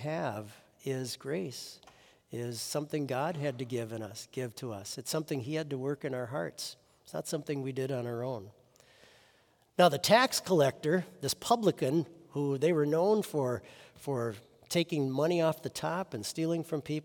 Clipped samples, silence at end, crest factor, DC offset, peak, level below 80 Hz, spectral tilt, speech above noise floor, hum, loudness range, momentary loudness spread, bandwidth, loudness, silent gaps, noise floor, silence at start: under 0.1%; 0 s; 24 dB; under 0.1%; -10 dBFS; -74 dBFS; -5 dB/octave; 35 dB; none; 9 LU; 13 LU; 18 kHz; -32 LUFS; none; -67 dBFS; 0 s